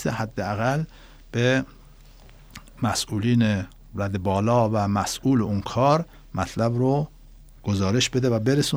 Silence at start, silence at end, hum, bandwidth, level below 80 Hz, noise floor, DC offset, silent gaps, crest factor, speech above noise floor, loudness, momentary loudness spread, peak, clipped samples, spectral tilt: 0 s; 0 s; none; over 20 kHz; -48 dBFS; -48 dBFS; under 0.1%; none; 18 dB; 25 dB; -24 LUFS; 10 LU; -6 dBFS; under 0.1%; -5.5 dB/octave